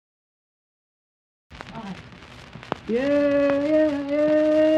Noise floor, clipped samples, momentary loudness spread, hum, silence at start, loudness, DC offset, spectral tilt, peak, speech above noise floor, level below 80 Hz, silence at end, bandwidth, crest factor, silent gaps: -44 dBFS; under 0.1%; 23 LU; none; 1.5 s; -21 LUFS; under 0.1%; -6.5 dB/octave; -4 dBFS; 23 dB; -54 dBFS; 0 s; 8.4 kHz; 20 dB; none